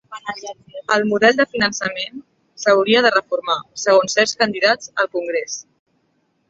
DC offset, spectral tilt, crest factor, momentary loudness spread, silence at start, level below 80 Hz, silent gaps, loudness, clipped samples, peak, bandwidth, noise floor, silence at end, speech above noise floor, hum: under 0.1%; -2.5 dB/octave; 18 dB; 15 LU; 0.1 s; -62 dBFS; none; -17 LUFS; under 0.1%; -2 dBFS; 8 kHz; -66 dBFS; 0.85 s; 48 dB; none